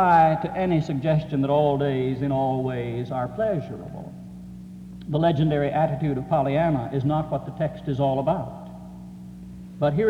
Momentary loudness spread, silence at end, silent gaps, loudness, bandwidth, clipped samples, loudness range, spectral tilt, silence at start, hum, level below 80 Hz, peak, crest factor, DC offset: 19 LU; 0 s; none; -24 LUFS; 7.2 kHz; under 0.1%; 4 LU; -9 dB/octave; 0 s; none; -50 dBFS; -8 dBFS; 16 dB; under 0.1%